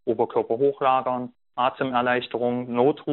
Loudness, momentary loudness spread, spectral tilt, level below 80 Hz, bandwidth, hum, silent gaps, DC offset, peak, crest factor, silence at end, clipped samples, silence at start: -24 LUFS; 5 LU; -4 dB/octave; -68 dBFS; 4.2 kHz; none; none; under 0.1%; -6 dBFS; 18 dB; 0 s; under 0.1%; 0.05 s